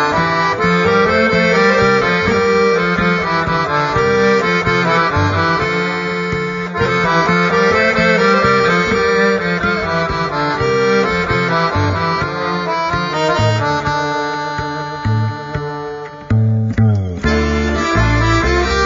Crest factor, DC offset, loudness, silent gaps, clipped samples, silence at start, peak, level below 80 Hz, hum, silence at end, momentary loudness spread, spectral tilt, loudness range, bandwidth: 14 dB; under 0.1%; -14 LUFS; none; under 0.1%; 0 s; 0 dBFS; -30 dBFS; none; 0 s; 7 LU; -6 dB/octave; 5 LU; 7.6 kHz